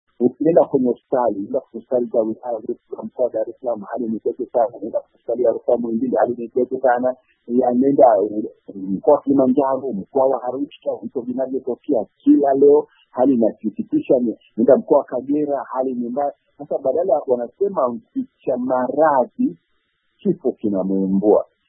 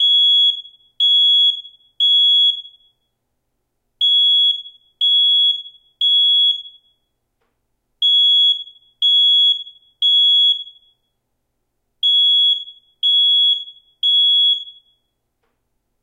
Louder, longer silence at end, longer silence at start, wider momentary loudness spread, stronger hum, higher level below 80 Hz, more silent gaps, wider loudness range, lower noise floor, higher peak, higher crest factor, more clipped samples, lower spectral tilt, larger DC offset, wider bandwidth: second, -19 LUFS vs -12 LUFS; second, 0.25 s vs 1.3 s; first, 0.2 s vs 0 s; about the same, 12 LU vs 11 LU; neither; first, -64 dBFS vs -76 dBFS; neither; first, 5 LU vs 2 LU; second, -68 dBFS vs -72 dBFS; first, 0 dBFS vs -8 dBFS; first, 18 dB vs 8 dB; neither; first, -13 dB/octave vs 4 dB/octave; neither; second, 3.4 kHz vs 10.5 kHz